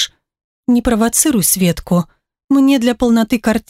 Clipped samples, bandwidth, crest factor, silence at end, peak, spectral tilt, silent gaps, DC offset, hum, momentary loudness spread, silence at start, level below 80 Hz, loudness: under 0.1%; 16.5 kHz; 14 dB; 0.1 s; 0 dBFS; -4 dB/octave; 0.44-0.63 s, 2.44-2.48 s; under 0.1%; none; 6 LU; 0 s; -38 dBFS; -14 LUFS